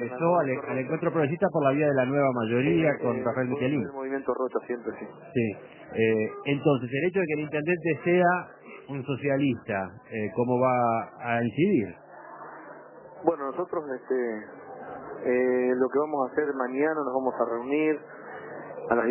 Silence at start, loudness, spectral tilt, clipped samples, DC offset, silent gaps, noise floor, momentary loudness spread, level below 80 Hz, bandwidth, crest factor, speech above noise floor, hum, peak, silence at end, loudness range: 0 s; -27 LUFS; -11 dB/octave; under 0.1%; under 0.1%; none; -46 dBFS; 17 LU; -66 dBFS; 3.2 kHz; 20 dB; 20 dB; none; -8 dBFS; 0 s; 4 LU